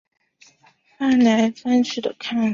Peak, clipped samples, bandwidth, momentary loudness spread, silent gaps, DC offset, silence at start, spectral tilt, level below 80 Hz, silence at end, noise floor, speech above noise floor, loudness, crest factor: -6 dBFS; under 0.1%; 7.4 kHz; 9 LU; none; under 0.1%; 1 s; -5 dB/octave; -64 dBFS; 0 s; -57 dBFS; 39 dB; -20 LUFS; 16 dB